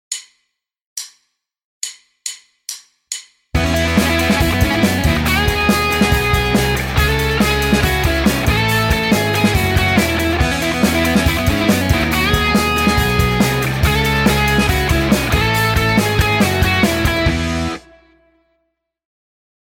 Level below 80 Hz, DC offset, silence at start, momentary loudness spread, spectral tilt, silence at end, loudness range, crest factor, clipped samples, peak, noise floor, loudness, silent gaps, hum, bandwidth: -24 dBFS; under 0.1%; 0.1 s; 13 LU; -4.5 dB/octave; 1.95 s; 5 LU; 14 dB; under 0.1%; -2 dBFS; -70 dBFS; -15 LUFS; 0.86-0.96 s, 1.64-1.81 s; none; 17 kHz